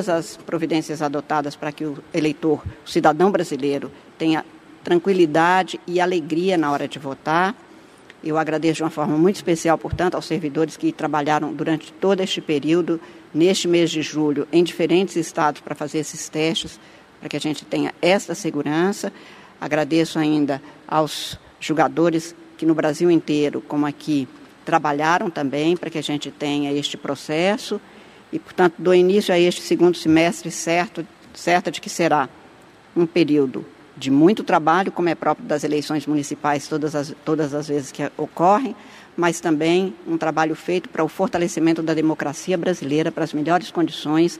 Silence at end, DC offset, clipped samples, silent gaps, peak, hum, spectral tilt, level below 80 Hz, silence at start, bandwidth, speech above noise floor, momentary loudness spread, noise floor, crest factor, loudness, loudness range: 0 s; under 0.1%; under 0.1%; none; 0 dBFS; none; -5 dB/octave; -56 dBFS; 0 s; 14.5 kHz; 27 dB; 11 LU; -47 dBFS; 20 dB; -21 LUFS; 3 LU